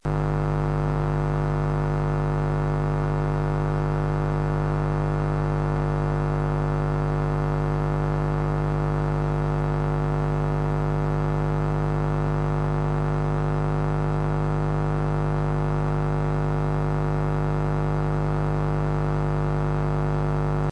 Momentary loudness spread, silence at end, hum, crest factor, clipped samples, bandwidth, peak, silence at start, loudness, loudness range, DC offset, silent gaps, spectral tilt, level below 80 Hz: 0 LU; 0 s; none; 12 dB; under 0.1%; 6.6 kHz; -10 dBFS; 0.05 s; -25 LUFS; 0 LU; under 0.1%; none; -9 dB/octave; -32 dBFS